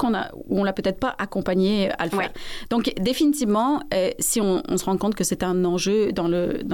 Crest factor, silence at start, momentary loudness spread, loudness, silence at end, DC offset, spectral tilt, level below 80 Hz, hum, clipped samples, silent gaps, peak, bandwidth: 12 dB; 0 s; 6 LU; -23 LUFS; 0 s; under 0.1%; -4.5 dB/octave; -46 dBFS; none; under 0.1%; none; -12 dBFS; 17 kHz